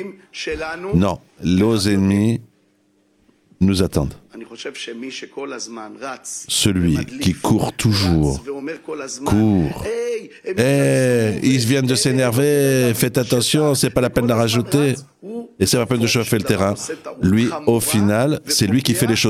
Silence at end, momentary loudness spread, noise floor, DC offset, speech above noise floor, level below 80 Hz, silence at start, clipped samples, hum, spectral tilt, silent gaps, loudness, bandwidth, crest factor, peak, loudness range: 0 s; 13 LU; -60 dBFS; under 0.1%; 42 dB; -42 dBFS; 0 s; under 0.1%; none; -5 dB/octave; none; -18 LUFS; 16.5 kHz; 18 dB; 0 dBFS; 7 LU